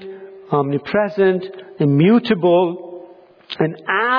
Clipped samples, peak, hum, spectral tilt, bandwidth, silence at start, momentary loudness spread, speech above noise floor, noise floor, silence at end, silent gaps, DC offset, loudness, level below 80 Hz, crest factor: under 0.1%; -4 dBFS; none; -9.5 dB/octave; 5.4 kHz; 0 s; 20 LU; 27 dB; -43 dBFS; 0 s; none; under 0.1%; -17 LUFS; -62 dBFS; 14 dB